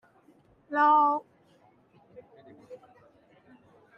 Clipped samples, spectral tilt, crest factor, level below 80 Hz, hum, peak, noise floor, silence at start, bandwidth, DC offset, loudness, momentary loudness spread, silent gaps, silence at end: under 0.1%; -6 dB/octave; 18 dB; -80 dBFS; none; -14 dBFS; -62 dBFS; 0.7 s; 5.8 kHz; under 0.1%; -24 LUFS; 29 LU; none; 1.2 s